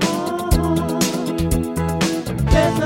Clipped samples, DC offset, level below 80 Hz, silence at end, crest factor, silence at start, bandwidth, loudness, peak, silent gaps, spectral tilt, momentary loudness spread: under 0.1%; under 0.1%; -26 dBFS; 0 s; 16 dB; 0 s; 17 kHz; -20 LUFS; -2 dBFS; none; -5.5 dB/octave; 5 LU